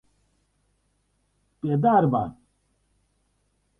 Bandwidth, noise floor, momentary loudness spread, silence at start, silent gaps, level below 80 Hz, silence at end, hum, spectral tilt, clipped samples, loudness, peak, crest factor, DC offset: 3.8 kHz; -70 dBFS; 14 LU; 1.65 s; none; -60 dBFS; 1.5 s; 50 Hz at -50 dBFS; -10.5 dB/octave; under 0.1%; -23 LUFS; -8 dBFS; 20 dB; under 0.1%